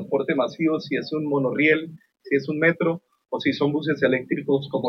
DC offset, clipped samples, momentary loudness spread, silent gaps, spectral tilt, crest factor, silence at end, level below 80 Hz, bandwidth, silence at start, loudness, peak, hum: under 0.1%; under 0.1%; 6 LU; none; -7.5 dB/octave; 18 dB; 0 s; -70 dBFS; 6.6 kHz; 0 s; -23 LUFS; -6 dBFS; none